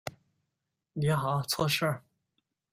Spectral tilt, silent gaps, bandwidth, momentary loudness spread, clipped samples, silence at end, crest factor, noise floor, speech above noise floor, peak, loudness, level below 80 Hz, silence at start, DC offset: -5 dB/octave; none; 16 kHz; 14 LU; under 0.1%; 0.75 s; 18 dB; -85 dBFS; 56 dB; -14 dBFS; -29 LUFS; -64 dBFS; 0.05 s; under 0.1%